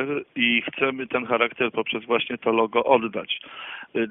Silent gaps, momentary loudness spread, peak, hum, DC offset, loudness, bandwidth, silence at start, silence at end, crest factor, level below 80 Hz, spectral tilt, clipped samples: none; 9 LU; -4 dBFS; none; under 0.1%; -23 LUFS; 3.9 kHz; 0 s; 0 s; 20 dB; -66 dBFS; -1.5 dB/octave; under 0.1%